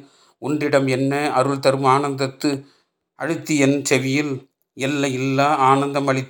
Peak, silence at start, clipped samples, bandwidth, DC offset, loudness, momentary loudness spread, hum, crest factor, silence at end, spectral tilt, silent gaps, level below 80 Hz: -2 dBFS; 0.4 s; under 0.1%; 19.5 kHz; under 0.1%; -19 LUFS; 10 LU; none; 18 dB; 0 s; -5 dB/octave; none; -68 dBFS